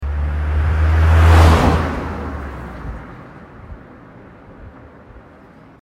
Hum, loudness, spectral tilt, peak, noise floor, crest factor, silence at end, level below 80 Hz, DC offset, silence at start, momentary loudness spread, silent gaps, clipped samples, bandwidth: none; -15 LUFS; -7 dB/octave; 0 dBFS; -43 dBFS; 16 dB; 0.65 s; -20 dBFS; under 0.1%; 0 s; 27 LU; none; under 0.1%; 11.5 kHz